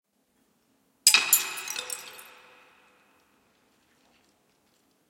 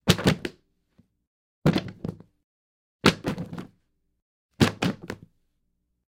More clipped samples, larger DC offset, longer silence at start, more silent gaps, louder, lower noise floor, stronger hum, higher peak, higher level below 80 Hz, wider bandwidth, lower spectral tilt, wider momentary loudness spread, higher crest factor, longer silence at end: neither; neither; first, 1.05 s vs 0.05 s; second, none vs 1.27-1.62 s, 2.44-2.99 s, 4.22-4.49 s; first, -23 LUFS vs -26 LUFS; second, -70 dBFS vs -75 dBFS; neither; about the same, 0 dBFS vs 0 dBFS; second, -80 dBFS vs -50 dBFS; about the same, 17 kHz vs 17 kHz; second, 3.5 dB/octave vs -5 dB/octave; first, 23 LU vs 16 LU; about the same, 32 dB vs 28 dB; first, 2.85 s vs 0.95 s